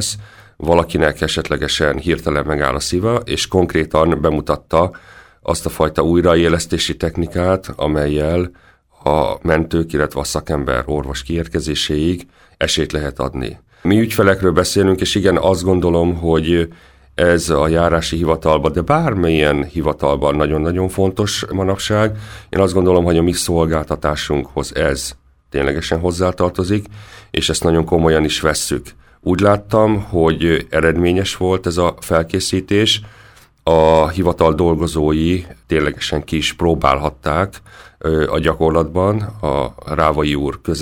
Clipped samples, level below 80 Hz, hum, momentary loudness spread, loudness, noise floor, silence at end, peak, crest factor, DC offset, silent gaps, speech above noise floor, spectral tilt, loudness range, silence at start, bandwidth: under 0.1%; -32 dBFS; none; 7 LU; -16 LUFS; -45 dBFS; 0 s; 0 dBFS; 16 dB; under 0.1%; none; 29 dB; -5 dB/octave; 3 LU; 0 s; 19 kHz